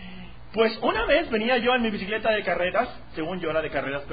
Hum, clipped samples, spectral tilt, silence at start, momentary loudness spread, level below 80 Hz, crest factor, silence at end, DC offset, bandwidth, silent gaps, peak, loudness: none; under 0.1%; -9.5 dB/octave; 0 s; 11 LU; -46 dBFS; 18 dB; 0 s; 0.8%; 5 kHz; none; -8 dBFS; -25 LUFS